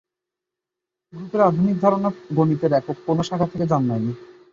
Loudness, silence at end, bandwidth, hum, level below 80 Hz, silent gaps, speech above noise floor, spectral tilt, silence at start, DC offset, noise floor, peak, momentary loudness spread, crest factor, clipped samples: -21 LUFS; 0.2 s; 7.6 kHz; none; -56 dBFS; none; 65 dB; -8.5 dB/octave; 1.15 s; under 0.1%; -85 dBFS; -4 dBFS; 9 LU; 18 dB; under 0.1%